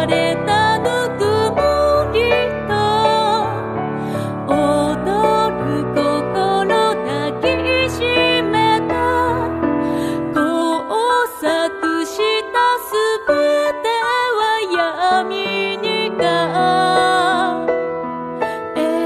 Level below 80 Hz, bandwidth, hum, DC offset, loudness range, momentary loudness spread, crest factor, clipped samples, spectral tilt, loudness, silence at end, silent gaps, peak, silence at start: -44 dBFS; 14 kHz; none; under 0.1%; 2 LU; 6 LU; 14 dB; under 0.1%; -5 dB/octave; -17 LUFS; 0 s; none; -2 dBFS; 0 s